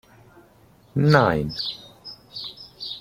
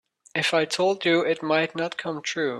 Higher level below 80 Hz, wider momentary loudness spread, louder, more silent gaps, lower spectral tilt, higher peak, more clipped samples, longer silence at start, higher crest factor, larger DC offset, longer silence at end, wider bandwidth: first, -50 dBFS vs -72 dBFS; first, 20 LU vs 7 LU; about the same, -22 LUFS vs -24 LUFS; neither; first, -7 dB/octave vs -4 dB/octave; first, -2 dBFS vs -8 dBFS; neither; first, 0.95 s vs 0.35 s; first, 22 dB vs 16 dB; neither; about the same, 0 s vs 0 s; first, 14.5 kHz vs 13 kHz